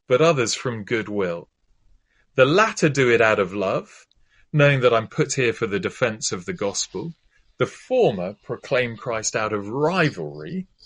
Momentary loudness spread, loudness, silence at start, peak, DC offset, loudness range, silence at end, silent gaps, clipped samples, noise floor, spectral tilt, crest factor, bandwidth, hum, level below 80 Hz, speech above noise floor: 13 LU; -21 LUFS; 0.1 s; -2 dBFS; under 0.1%; 5 LU; 0.2 s; none; under 0.1%; -58 dBFS; -4.5 dB/octave; 20 dB; 10.5 kHz; none; -58 dBFS; 37 dB